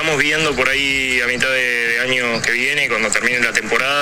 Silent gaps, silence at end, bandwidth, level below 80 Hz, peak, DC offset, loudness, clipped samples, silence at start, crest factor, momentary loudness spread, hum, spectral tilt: none; 0 s; 17 kHz; -44 dBFS; 0 dBFS; under 0.1%; -15 LUFS; under 0.1%; 0 s; 18 dB; 1 LU; none; -2 dB/octave